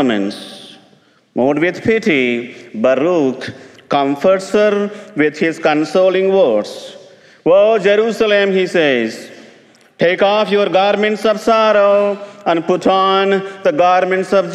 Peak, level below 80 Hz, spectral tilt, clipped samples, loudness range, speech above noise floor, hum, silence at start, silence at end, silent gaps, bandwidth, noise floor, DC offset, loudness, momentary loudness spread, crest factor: -2 dBFS; -60 dBFS; -5.5 dB/octave; under 0.1%; 3 LU; 37 dB; none; 0 s; 0 s; none; 12.5 kHz; -51 dBFS; under 0.1%; -14 LUFS; 11 LU; 12 dB